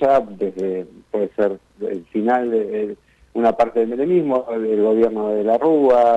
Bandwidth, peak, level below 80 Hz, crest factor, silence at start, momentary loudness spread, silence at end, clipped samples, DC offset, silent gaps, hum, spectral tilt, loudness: 8 kHz; -6 dBFS; -56 dBFS; 12 dB; 0 s; 12 LU; 0 s; under 0.1%; under 0.1%; none; none; -8 dB/octave; -19 LUFS